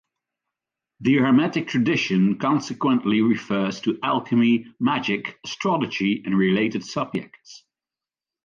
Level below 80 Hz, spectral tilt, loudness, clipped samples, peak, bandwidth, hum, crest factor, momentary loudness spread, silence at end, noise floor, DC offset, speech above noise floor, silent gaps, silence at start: -64 dBFS; -6 dB/octave; -22 LUFS; under 0.1%; -8 dBFS; 7.4 kHz; none; 14 dB; 8 LU; 0.9 s; under -90 dBFS; under 0.1%; over 68 dB; none; 1 s